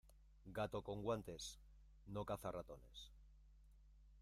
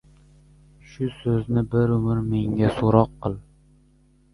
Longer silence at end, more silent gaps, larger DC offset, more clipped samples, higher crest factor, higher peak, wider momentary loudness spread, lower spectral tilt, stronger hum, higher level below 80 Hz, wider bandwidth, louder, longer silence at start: second, 0 s vs 0.9 s; neither; neither; neither; about the same, 20 dB vs 22 dB; second, -30 dBFS vs -2 dBFS; first, 20 LU vs 12 LU; second, -5 dB/octave vs -9.5 dB/octave; neither; second, -64 dBFS vs -44 dBFS; first, 15.5 kHz vs 11 kHz; second, -49 LUFS vs -23 LUFS; second, 0.05 s vs 1 s